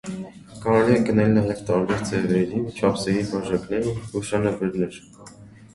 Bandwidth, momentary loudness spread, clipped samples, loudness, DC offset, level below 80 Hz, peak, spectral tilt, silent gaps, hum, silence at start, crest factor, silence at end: 11.5 kHz; 11 LU; under 0.1%; -23 LUFS; under 0.1%; -50 dBFS; -4 dBFS; -6.5 dB/octave; none; none; 0.05 s; 18 dB; 0.1 s